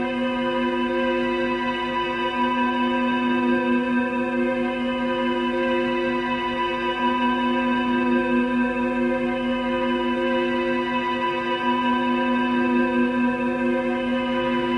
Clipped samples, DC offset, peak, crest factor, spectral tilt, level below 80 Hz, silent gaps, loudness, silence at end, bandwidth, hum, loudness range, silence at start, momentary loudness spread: under 0.1%; under 0.1%; -10 dBFS; 12 dB; -6 dB/octave; -50 dBFS; none; -22 LUFS; 0 s; 6.2 kHz; none; 1 LU; 0 s; 3 LU